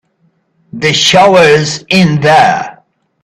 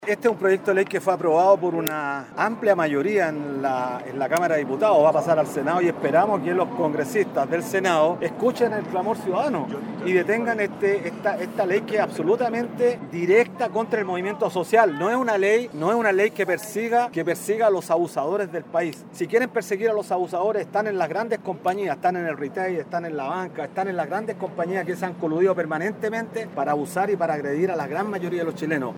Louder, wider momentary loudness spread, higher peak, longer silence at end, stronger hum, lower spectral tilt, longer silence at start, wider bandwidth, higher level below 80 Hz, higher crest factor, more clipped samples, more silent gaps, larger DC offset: first, -8 LUFS vs -23 LUFS; about the same, 9 LU vs 8 LU; about the same, 0 dBFS vs -2 dBFS; first, 0.5 s vs 0 s; neither; second, -4 dB/octave vs -5.5 dB/octave; first, 0.75 s vs 0 s; second, 13.5 kHz vs 17 kHz; first, -46 dBFS vs -72 dBFS; second, 10 dB vs 20 dB; first, 0.2% vs under 0.1%; neither; neither